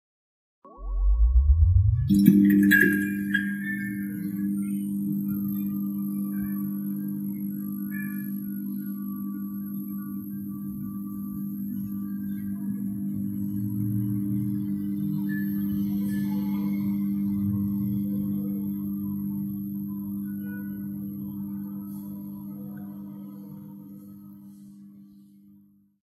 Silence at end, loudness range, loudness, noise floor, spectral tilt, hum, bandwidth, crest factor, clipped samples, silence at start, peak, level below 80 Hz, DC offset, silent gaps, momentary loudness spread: 0.85 s; 15 LU; -28 LUFS; -57 dBFS; -7 dB/octave; none; 15 kHz; 24 dB; under 0.1%; 0.65 s; -2 dBFS; -34 dBFS; under 0.1%; none; 17 LU